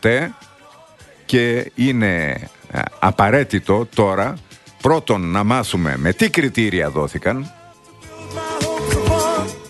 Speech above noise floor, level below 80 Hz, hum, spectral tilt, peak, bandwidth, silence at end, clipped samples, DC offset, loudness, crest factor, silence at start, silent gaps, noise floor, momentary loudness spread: 28 dB; -38 dBFS; none; -5.5 dB/octave; 0 dBFS; 12.5 kHz; 0 s; under 0.1%; under 0.1%; -18 LUFS; 18 dB; 0.05 s; none; -46 dBFS; 12 LU